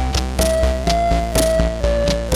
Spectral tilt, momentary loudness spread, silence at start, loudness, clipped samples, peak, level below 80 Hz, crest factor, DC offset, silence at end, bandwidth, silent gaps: -5 dB/octave; 2 LU; 0 s; -18 LUFS; under 0.1%; -2 dBFS; -22 dBFS; 16 dB; under 0.1%; 0 s; 16 kHz; none